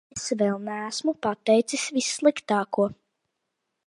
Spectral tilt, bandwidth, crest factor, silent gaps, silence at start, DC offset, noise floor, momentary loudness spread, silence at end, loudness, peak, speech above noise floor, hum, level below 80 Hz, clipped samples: -3.5 dB/octave; 11.5 kHz; 20 dB; none; 0.15 s; under 0.1%; -80 dBFS; 7 LU; 0.95 s; -25 LUFS; -6 dBFS; 56 dB; none; -68 dBFS; under 0.1%